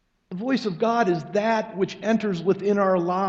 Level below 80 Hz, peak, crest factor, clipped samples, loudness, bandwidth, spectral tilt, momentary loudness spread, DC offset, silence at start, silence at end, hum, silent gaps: -66 dBFS; -8 dBFS; 16 dB; under 0.1%; -24 LUFS; 7.8 kHz; -6.5 dB/octave; 6 LU; under 0.1%; 0.3 s; 0 s; none; none